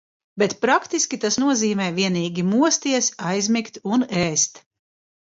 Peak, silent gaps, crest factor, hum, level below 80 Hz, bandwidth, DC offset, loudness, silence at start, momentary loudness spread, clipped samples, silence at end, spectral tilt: -4 dBFS; none; 18 dB; none; -62 dBFS; 7.8 kHz; under 0.1%; -21 LUFS; 0.35 s; 5 LU; under 0.1%; 0.8 s; -3.5 dB/octave